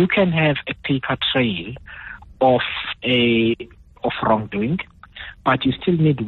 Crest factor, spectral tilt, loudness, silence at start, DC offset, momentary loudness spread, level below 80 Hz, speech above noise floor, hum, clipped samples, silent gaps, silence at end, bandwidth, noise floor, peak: 16 dB; -9 dB/octave; -20 LUFS; 0 s; under 0.1%; 19 LU; -46 dBFS; 19 dB; none; under 0.1%; none; 0 s; 4.3 kHz; -39 dBFS; -4 dBFS